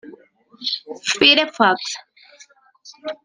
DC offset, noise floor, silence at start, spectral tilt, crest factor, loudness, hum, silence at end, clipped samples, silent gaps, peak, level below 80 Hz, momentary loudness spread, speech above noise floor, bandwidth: under 0.1%; -51 dBFS; 0.05 s; -1.5 dB/octave; 22 dB; -17 LUFS; none; 0.1 s; under 0.1%; none; 0 dBFS; -66 dBFS; 20 LU; 32 dB; 10 kHz